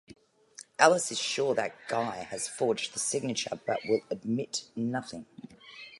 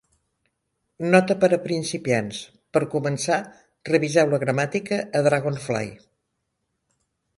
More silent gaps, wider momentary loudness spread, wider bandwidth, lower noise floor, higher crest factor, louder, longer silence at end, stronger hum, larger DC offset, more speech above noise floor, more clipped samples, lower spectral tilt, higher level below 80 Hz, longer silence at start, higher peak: neither; first, 21 LU vs 11 LU; about the same, 11.5 kHz vs 11.5 kHz; second, -54 dBFS vs -77 dBFS; about the same, 26 dB vs 22 dB; second, -30 LUFS vs -23 LUFS; second, 0 s vs 1.45 s; neither; neither; second, 23 dB vs 55 dB; neither; second, -3 dB/octave vs -5.5 dB/octave; second, -74 dBFS vs -64 dBFS; second, 0.8 s vs 1 s; about the same, -4 dBFS vs -2 dBFS